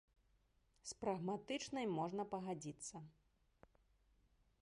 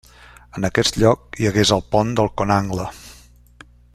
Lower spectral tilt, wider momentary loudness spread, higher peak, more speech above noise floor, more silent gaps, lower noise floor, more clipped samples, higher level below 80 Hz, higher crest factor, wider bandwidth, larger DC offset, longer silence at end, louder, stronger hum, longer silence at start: about the same, -5 dB/octave vs -5 dB/octave; about the same, 12 LU vs 13 LU; second, -30 dBFS vs -2 dBFS; first, 33 dB vs 29 dB; neither; first, -78 dBFS vs -47 dBFS; neither; second, -76 dBFS vs -42 dBFS; about the same, 18 dB vs 18 dB; second, 11 kHz vs 14 kHz; neither; first, 1.5 s vs 0.8 s; second, -45 LUFS vs -19 LUFS; second, none vs 60 Hz at -40 dBFS; first, 0.85 s vs 0.55 s